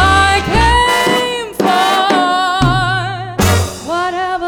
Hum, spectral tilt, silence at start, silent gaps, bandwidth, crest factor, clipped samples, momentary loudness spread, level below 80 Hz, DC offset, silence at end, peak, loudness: none; -4 dB/octave; 0 s; none; over 20 kHz; 12 dB; under 0.1%; 8 LU; -26 dBFS; under 0.1%; 0 s; -2 dBFS; -13 LUFS